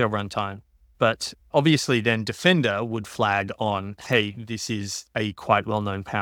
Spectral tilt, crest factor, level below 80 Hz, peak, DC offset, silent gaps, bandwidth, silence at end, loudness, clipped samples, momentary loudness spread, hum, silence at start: -5 dB/octave; 22 dB; -58 dBFS; -2 dBFS; under 0.1%; none; 18 kHz; 0 s; -24 LUFS; under 0.1%; 10 LU; none; 0 s